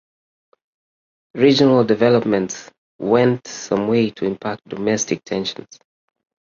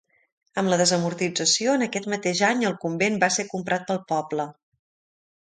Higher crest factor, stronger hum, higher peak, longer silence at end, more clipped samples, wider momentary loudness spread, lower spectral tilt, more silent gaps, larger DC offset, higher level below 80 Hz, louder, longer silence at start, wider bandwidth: about the same, 18 dB vs 18 dB; neither; first, -2 dBFS vs -6 dBFS; first, 1.05 s vs 0.9 s; neither; first, 13 LU vs 7 LU; first, -5 dB/octave vs -3 dB/octave; first, 2.78-2.99 s vs none; neither; first, -58 dBFS vs -68 dBFS; first, -18 LUFS vs -23 LUFS; first, 1.35 s vs 0.55 s; second, 7.4 kHz vs 9.6 kHz